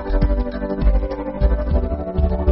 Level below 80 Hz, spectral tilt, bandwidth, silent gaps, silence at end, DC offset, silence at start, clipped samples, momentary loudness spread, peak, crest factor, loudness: -20 dBFS; -8.5 dB/octave; 5.6 kHz; none; 0 s; under 0.1%; 0 s; under 0.1%; 4 LU; -4 dBFS; 14 dB; -21 LUFS